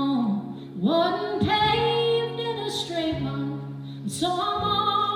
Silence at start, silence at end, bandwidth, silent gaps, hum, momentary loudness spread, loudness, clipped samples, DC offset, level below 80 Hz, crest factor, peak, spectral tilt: 0 s; 0 s; 17 kHz; none; none; 11 LU; -25 LUFS; under 0.1%; under 0.1%; -52 dBFS; 14 dB; -10 dBFS; -5 dB/octave